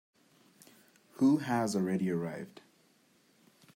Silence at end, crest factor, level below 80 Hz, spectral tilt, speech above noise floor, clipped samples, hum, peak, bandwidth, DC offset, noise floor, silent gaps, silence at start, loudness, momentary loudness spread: 1.25 s; 18 dB; -78 dBFS; -6.5 dB/octave; 37 dB; under 0.1%; none; -18 dBFS; 16 kHz; under 0.1%; -68 dBFS; none; 1.2 s; -31 LUFS; 15 LU